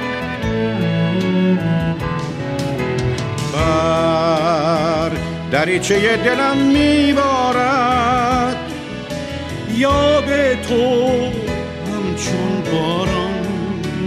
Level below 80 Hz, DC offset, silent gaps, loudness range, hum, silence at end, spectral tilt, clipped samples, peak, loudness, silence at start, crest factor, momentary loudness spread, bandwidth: -36 dBFS; under 0.1%; none; 4 LU; none; 0 s; -5.5 dB/octave; under 0.1%; -2 dBFS; -17 LUFS; 0 s; 14 dB; 9 LU; 14.5 kHz